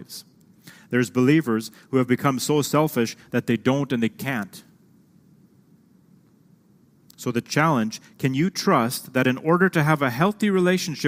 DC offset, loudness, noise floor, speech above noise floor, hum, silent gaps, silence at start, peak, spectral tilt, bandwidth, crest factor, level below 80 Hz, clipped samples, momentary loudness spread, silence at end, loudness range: under 0.1%; -22 LUFS; -57 dBFS; 35 dB; none; none; 0 s; -2 dBFS; -5.5 dB/octave; 16 kHz; 20 dB; -66 dBFS; under 0.1%; 9 LU; 0 s; 11 LU